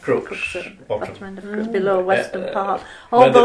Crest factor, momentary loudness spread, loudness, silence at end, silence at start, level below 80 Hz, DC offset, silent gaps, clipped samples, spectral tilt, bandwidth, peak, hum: 18 dB; 13 LU; -20 LUFS; 0 s; 0 s; -54 dBFS; under 0.1%; none; under 0.1%; -5.5 dB/octave; 11 kHz; 0 dBFS; none